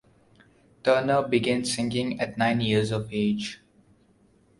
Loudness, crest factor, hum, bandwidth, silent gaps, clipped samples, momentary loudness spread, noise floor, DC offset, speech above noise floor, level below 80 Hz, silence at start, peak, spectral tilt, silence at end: -25 LUFS; 18 dB; none; 11.5 kHz; none; under 0.1%; 7 LU; -61 dBFS; under 0.1%; 36 dB; -58 dBFS; 0.85 s; -8 dBFS; -5 dB/octave; 1.05 s